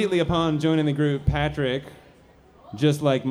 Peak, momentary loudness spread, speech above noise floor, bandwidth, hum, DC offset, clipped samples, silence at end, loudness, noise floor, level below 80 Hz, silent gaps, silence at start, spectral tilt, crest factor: -8 dBFS; 5 LU; 31 dB; 13.5 kHz; none; under 0.1%; under 0.1%; 0 s; -23 LUFS; -53 dBFS; -40 dBFS; none; 0 s; -7 dB/octave; 16 dB